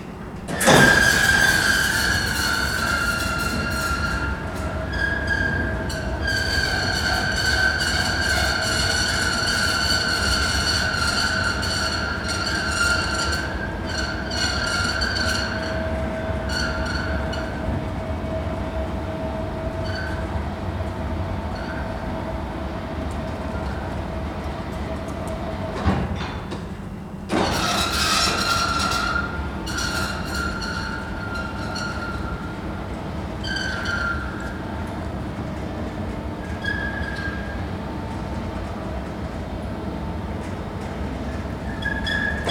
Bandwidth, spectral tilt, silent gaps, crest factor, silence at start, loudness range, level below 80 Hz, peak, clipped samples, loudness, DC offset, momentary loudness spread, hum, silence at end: 20 kHz; -3.5 dB/octave; none; 24 dB; 0 s; 9 LU; -34 dBFS; 0 dBFS; under 0.1%; -23 LUFS; under 0.1%; 11 LU; none; 0 s